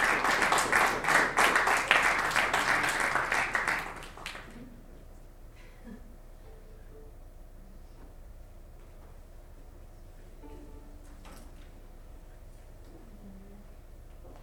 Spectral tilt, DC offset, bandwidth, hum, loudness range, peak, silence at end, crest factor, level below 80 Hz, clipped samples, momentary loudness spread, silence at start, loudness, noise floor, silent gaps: -2 dB/octave; under 0.1%; over 20 kHz; none; 27 LU; -6 dBFS; 0 s; 26 dB; -50 dBFS; under 0.1%; 27 LU; 0 s; -26 LUFS; -49 dBFS; none